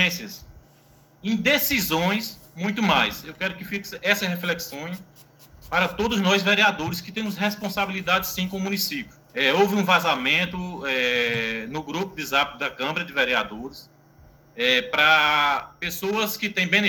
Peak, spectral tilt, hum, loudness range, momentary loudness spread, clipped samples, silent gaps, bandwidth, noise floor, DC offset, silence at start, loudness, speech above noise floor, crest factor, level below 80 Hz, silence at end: -4 dBFS; -3.5 dB/octave; none; 4 LU; 13 LU; under 0.1%; none; 19.5 kHz; -55 dBFS; under 0.1%; 0 s; -22 LUFS; 31 dB; 20 dB; -54 dBFS; 0 s